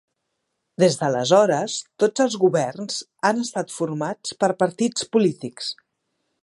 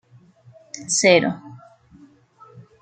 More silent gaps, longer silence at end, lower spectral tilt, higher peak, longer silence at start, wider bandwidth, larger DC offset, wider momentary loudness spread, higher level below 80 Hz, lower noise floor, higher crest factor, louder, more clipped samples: neither; first, 0.7 s vs 0.2 s; first, -4.5 dB/octave vs -3 dB/octave; about the same, -2 dBFS vs -2 dBFS; about the same, 0.8 s vs 0.75 s; first, 11.5 kHz vs 9.4 kHz; neither; second, 12 LU vs 21 LU; second, -72 dBFS vs -66 dBFS; first, -77 dBFS vs -51 dBFS; about the same, 20 dB vs 22 dB; second, -22 LUFS vs -17 LUFS; neither